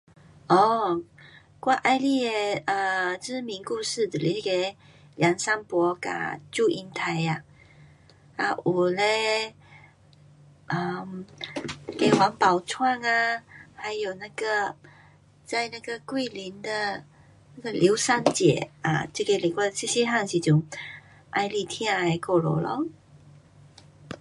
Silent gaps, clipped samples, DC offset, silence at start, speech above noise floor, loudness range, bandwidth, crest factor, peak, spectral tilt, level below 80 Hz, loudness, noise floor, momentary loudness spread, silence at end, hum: none; under 0.1%; under 0.1%; 0.5 s; 30 dB; 5 LU; 11.5 kHz; 24 dB; -2 dBFS; -4.5 dB/octave; -64 dBFS; -26 LUFS; -55 dBFS; 13 LU; 0.05 s; none